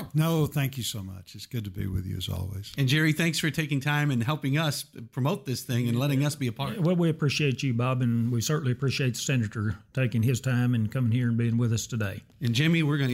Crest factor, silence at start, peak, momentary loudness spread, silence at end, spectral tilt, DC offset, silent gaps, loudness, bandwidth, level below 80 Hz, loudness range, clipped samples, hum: 16 dB; 0 s; -12 dBFS; 9 LU; 0 s; -5.5 dB/octave; under 0.1%; none; -27 LUFS; 16 kHz; -56 dBFS; 2 LU; under 0.1%; none